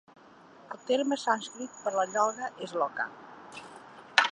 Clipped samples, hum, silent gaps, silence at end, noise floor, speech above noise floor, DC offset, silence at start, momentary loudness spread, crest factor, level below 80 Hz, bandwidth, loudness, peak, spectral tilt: under 0.1%; none; none; 0 s; -54 dBFS; 24 dB; under 0.1%; 0.6 s; 19 LU; 28 dB; -82 dBFS; 11 kHz; -30 LUFS; -4 dBFS; -2 dB/octave